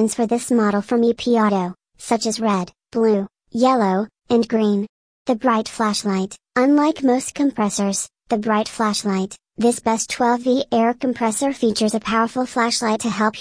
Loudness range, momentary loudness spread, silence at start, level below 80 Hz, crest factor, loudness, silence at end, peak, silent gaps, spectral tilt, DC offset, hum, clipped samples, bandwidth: 1 LU; 7 LU; 0 s; -58 dBFS; 16 dB; -20 LUFS; 0 s; -4 dBFS; 4.89-5.25 s; -4.5 dB/octave; under 0.1%; none; under 0.1%; 10.5 kHz